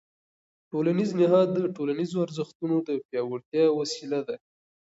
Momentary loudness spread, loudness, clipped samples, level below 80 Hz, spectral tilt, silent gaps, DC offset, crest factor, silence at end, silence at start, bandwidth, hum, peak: 10 LU; -27 LUFS; under 0.1%; -76 dBFS; -6.5 dB/octave; 2.55-2.60 s, 3.05-3.09 s, 3.45-3.52 s; under 0.1%; 16 dB; 0.6 s; 0.75 s; 8 kHz; none; -10 dBFS